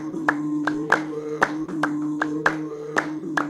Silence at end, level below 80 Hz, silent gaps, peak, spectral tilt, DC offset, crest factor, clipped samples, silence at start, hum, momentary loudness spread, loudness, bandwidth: 0 s; -64 dBFS; none; -2 dBFS; -5 dB/octave; under 0.1%; 22 dB; under 0.1%; 0 s; none; 4 LU; -25 LUFS; 12 kHz